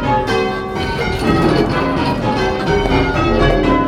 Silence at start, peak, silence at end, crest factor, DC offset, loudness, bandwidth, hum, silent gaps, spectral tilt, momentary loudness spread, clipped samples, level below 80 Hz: 0 s; 0 dBFS; 0 s; 14 dB; under 0.1%; -16 LUFS; 14.5 kHz; none; none; -6.5 dB/octave; 5 LU; under 0.1%; -26 dBFS